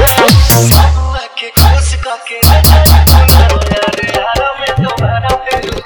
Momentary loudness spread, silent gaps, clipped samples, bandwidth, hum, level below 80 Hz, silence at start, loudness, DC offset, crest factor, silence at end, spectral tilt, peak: 10 LU; none; 2%; over 20 kHz; none; -12 dBFS; 0 s; -9 LUFS; under 0.1%; 8 dB; 0 s; -4.5 dB/octave; 0 dBFS